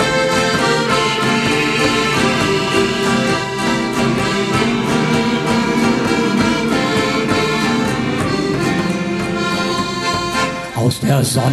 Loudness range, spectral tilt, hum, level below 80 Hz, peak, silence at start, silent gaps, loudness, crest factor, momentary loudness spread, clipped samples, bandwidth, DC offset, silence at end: 3 LU; -4.5 dB/octave; none; -40 dBFS; -2 dBFS; 0 s; none; -16 LUFS; 14 dB; 4 LU; under 0.1%; 14 kHz; under 0.1%; 0 s